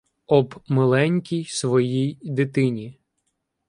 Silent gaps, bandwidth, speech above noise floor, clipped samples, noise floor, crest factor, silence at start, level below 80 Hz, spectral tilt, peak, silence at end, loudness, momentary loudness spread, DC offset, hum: none; 11.5 kHz; 54 dB; under 0.1%; -75 dBFS; 18 dB; 0.3 s; -64 dBFS; -6.5 dB/octave; -4 dBFS; 0.75 s; -22 LUFS; 7 LU; under 0.1%; none